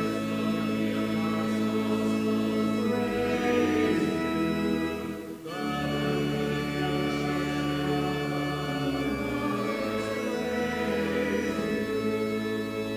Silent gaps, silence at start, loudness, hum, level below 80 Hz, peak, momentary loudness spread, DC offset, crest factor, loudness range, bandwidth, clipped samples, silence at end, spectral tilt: none; 0 s; -28 LUFS; none; -50 dBFS; -14 dBFS; 4 LU; under 0.1%; 14 dB; 3 LU; 16 kHz; under 0.1%; 0 s; -6 dB/octave